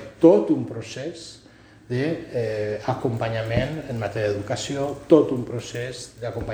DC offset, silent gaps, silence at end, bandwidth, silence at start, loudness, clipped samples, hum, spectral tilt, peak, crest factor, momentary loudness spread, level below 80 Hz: under 0.1%; none; 0 s; 10 kHz; 0 s; -24 LUFS; under 0.1%; none; -6.5 dB/octave; -2 dBFS; 22 dB; 15 LU; -48 dBFS